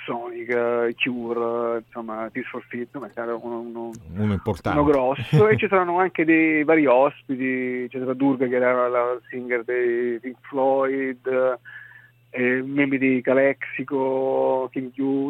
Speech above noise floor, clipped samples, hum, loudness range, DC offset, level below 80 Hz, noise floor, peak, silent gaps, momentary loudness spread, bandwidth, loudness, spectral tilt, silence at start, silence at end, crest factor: 27 dB; under 0.1%; none; 8 LU; under 0.1%; -52 dBFS; -49 dBFS; -6 dBFS; none; 14 LU; 9 kHz; -22 LUFS; -8 dB/octave; 0 s; 0 s; 18 dB